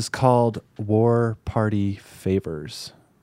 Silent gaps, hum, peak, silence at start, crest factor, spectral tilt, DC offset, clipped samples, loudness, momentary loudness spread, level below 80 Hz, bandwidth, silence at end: none; none; -2 dBFS; 0 s; 20 dB; -7 dB/octave; under 0.1%; under 0.1%; -23 LUFS; 15 LU; -48 dBFS; 14.5 kHz; 0.35 s